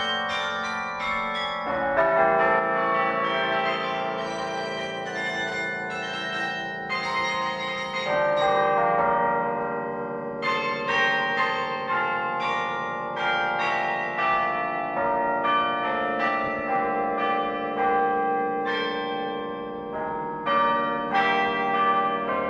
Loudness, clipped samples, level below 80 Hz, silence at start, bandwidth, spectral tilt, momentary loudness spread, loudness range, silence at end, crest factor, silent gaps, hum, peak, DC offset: -25 LUFS; under 0.1%; -60 dBFS; 0 s; 10.5 kHz; -4.5 dB/octave; 8 LU; 4 LU; 0 s; 18 dB; none; none; -8 dBFS; under 0.1%